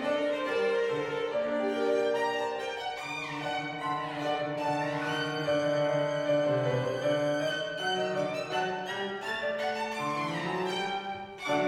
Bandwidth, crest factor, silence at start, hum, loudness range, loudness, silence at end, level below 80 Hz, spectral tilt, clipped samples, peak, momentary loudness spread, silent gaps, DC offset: 14 kHz; 14 dB; 0 s; none; 3 LU; -31 LUFS; 0 s; -70 dBFS; -5 dB/octave; under 0.1%; -18 dBFS; 6 LU; none; under 0.1%